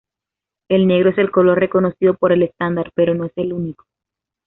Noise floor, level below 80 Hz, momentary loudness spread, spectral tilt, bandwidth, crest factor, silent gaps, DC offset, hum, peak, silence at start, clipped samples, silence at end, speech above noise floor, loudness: -86 dBFS; -54 dBFS; 9 LU; -6.5 dB/octave; 4 kHz; 14 dB; none; under 0.1%; none; -2 dBFS; 0.7 s; under 0.1%; 0.75 s; 70 dB; -16 LUFS